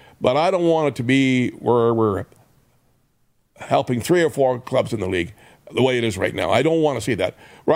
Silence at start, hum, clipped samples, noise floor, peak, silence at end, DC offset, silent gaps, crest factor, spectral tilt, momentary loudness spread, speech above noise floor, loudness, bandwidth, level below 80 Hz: 0.2 s; none; under 0.1%; -63 dBFS; 0 dBFS; 0 s; under 0.1%; none; 20 dB; -6 dB/octave; 9 LU; 44 dB; -20 LUFS; 16 kHz; -56 dBFS